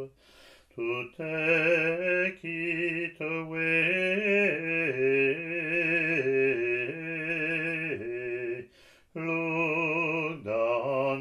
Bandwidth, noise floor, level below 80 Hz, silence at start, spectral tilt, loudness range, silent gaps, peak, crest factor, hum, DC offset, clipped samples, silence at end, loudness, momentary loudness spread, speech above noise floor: 11 kHz; -58 dBFS; -70 dBFS; 0 s; -6.5 dB/octave; 5 LU; none; -12 dBFS; 16 dB; none; under 0.1%; under 0.1%; 0 s; -28 LUFS; 10 LU; 30 dB